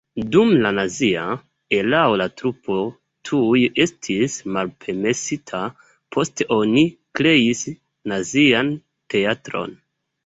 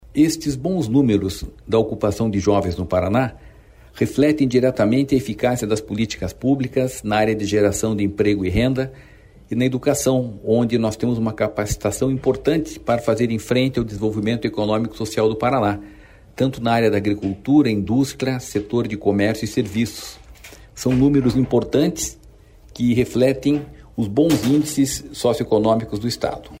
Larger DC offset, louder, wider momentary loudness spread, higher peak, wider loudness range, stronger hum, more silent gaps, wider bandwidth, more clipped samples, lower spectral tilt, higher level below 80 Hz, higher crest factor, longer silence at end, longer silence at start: neither; about the same, -20 LUFS vs -20 LUFS; first, 13 LU vs 7 LU; about the same, -2 dBFS vs -4 dBFS; about the same, 3 LU vs 2 LU; neither; neither; second, 8.2 kHz vs 16 kHz; neither; second, -4.5 dB/octave vs -6 dB/octave; second, -56 dBFS vs -42 dBFS; about the same, 18 dB vs 14 dB; first, 0.5 s vs 0.05 s; about the same, 0.15 s vs 0.15 s